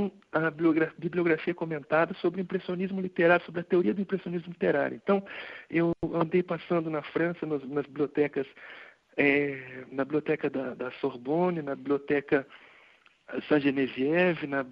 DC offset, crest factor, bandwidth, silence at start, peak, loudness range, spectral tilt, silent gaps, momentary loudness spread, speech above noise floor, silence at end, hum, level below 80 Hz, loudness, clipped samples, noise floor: under 0.1%; 20 dB; 5.4 kHz; 0 s; -8 dBFS; 3 LU; -9 dB/octave; none; 10 LU; 32 dB; 0 s; none; -66 dBFS; -29 LUFS; under 0.1%; -60 dBFS